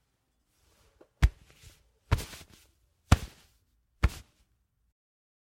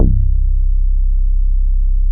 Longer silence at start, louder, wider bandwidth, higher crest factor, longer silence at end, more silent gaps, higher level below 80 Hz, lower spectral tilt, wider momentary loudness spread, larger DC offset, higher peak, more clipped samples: first, 1.2 s vs 0 s; second, -31 LUFS vs -19 LUFS; first, 16.5 kHz vs 0.6 kHz; first, 30 dB vs 12 dB; first, 1.25 s vs 0 s; neither; second, -36 dBFS vs -12 dBFS; second, -5.5 dB/octave vs -17.5 dB/octave; first, 20 LU vs 2 LU; neither; second, -4 dBFS vs 0 dBFS; neither